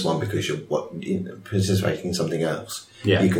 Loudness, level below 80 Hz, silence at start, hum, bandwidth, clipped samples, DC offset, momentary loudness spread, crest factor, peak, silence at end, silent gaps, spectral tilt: -25 LUFS; -54 dBFS; 0 s; none; 17 kHz; under 0.1%; under 0.1%; 7 LU; 18 dB; -6 dBFS; 0 s; none; -5.5 dB/octave